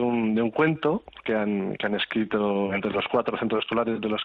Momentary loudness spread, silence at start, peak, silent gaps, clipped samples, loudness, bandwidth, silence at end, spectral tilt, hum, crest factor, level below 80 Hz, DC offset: 4 LU; 0 s; -10 dBFS; none; under 0.1%; -26 LUFS; 4.8 kHz; 0 s; -8.5 dB/octave; none; 16 dB; -60 dBFS; under 0.1%